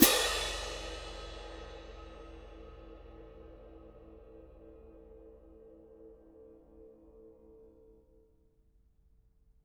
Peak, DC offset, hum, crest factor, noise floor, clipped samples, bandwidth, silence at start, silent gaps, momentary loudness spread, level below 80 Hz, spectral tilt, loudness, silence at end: -4 dBFS; under 0.1%; none; 34 dB; -67 dBFS; under 0.1%; 19.5 kHz; 0 s; none; 22 LU; -52 dBFS; -2 dB/octave; -34 LUFS; 1.75 s